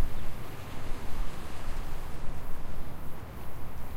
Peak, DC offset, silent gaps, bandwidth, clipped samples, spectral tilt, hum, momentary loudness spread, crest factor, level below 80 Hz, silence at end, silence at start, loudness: -14 dBFS; under 0.1%; none; 15 kHz; under 0.1%; -5.5 dB/octave; none; 3 LU; 12 dB; -34 dBFS; 0 s; 0 s; -42 LUFS